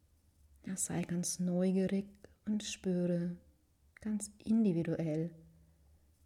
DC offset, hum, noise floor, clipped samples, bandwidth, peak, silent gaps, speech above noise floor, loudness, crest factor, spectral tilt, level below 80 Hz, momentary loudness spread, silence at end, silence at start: under 0.1%; none; -68 dBFS; under 0.1%; 15 kHz; -22 dBFS; none; 34 dB; -36 LUFS; 14 dB; -6 dB/octave; -68 dBFS; 13 LU; 0.8 s; 0.65 s